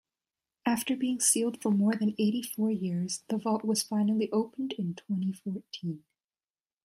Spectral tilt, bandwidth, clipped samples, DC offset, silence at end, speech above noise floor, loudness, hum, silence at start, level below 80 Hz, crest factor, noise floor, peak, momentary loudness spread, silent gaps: -4.5 dB/octave; 15.5 kHz; under 0.1%; under 0.1%; 0.85 s; over 60 dB; -30 LUFS; none; 0.65 s; -76 dBFS; 18 dB; under -90 dBFS; -12 dBFS; 12 LU; none